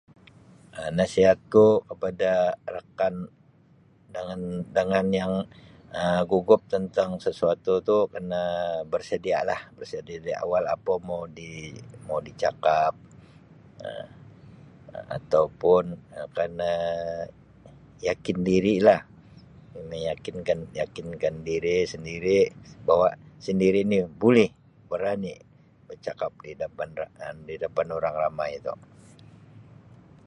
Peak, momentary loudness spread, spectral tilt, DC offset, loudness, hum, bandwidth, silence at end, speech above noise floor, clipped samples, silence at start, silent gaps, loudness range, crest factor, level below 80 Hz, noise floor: -4 dBFS; 17 LU; -6.5 dB/octave; under 0.1%; -25 LUFS; none; 10.5 kHz; 0.65 s; 33 dB; under 0.1%; 0.75 s; none; 8 LU; 22 dB; -56 dBFS; -58 dBFS